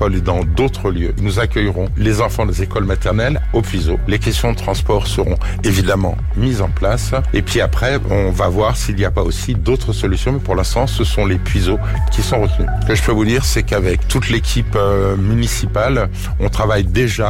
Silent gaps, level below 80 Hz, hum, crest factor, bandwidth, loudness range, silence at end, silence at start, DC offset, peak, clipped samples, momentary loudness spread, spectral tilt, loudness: none; -20 dBFS; none; 10 dB; 16.5 kHz; 1 LU; 0 s; 0 s; 0.4%; -4 dBFS; under 0.1%; 3 LU; -5.5 dB/octave; -16 LUFS